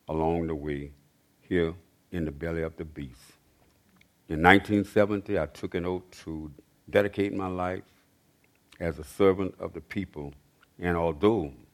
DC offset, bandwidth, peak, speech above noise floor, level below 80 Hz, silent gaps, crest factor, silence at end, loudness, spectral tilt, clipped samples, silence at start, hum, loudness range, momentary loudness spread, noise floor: under 0.1%; 15 kHz; 0 dBFS; 38 dB; -50 dBFS; none; 28 dB; 0.2 s; -28 LUFS; -7 dB/octave; under 0.1%; 0.1 s; none; 8 LU; 16 LU; -65 dBFS